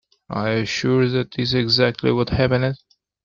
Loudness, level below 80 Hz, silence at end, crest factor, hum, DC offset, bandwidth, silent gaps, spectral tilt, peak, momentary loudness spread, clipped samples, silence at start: -20 LUFS; -44 dBFS; 0.5 s; 16 dB; none; under 0.1%; 7.4 kHz; none; -6 dB/octave; -4 dBFS; 8 LU; under 0.1%; 0.3 s